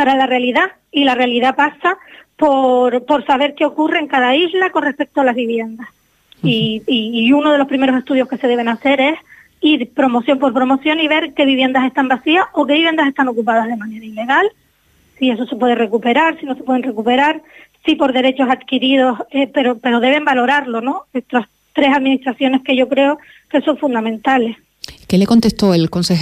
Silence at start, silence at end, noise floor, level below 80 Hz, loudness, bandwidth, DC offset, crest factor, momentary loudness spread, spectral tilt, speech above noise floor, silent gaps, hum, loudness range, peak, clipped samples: 0 s; 0 s; -55 dBFS; -52 dBFS; -15 LUFS; 13.5 kHz; under 0.1%; 12 dB; 7 LU; -5.5 dB/octave; 40 dB; none; none; 2 LU; -2 dBFS; under 0.1%